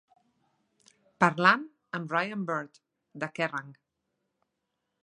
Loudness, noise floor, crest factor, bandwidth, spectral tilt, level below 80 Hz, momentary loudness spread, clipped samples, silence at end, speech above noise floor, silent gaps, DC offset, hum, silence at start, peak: -28 LUFS; -82 dBFS; 28 dB; 11 kHz; -5.5 dB/octave; -80 dBFS; 16 LU; under 0.1%; 1.3 s; 54 dB; none; under 0.1%; none; 1.2 s; -4 dBFS